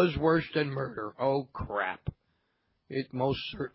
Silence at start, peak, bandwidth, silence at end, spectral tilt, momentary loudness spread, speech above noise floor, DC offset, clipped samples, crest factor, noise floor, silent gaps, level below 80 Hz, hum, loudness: 0 s; -12 dBFS; 5.8 kHz; 0.05 s; -10 dB/octave; 10 LU; 46 dB; under 0.1%; under 0.1%; 18 dB; -76 dBFS; none; -52 dBFS; none; -31 LUFS